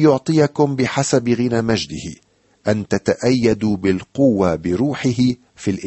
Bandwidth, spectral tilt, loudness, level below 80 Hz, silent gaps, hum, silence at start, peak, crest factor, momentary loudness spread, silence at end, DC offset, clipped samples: 8.6 kHz; -6 dB/octave; -18 LUFS; -48 dBFS; none; none; 0 s; -2 dBFS; 16 dB; 8 LU; 0 s; under 0.1%; under 0.1%